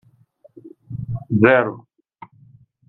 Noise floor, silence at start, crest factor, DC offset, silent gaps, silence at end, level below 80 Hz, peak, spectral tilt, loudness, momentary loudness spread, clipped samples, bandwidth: -54 dBFS; 0.65 s; 22 dB; under 0.1%; none; 1.1 s; -54 dBFS; 0 dBFS; -10 dB/octave; -18 LUFS; 20 LU; under 0.1%; 4.2 kHz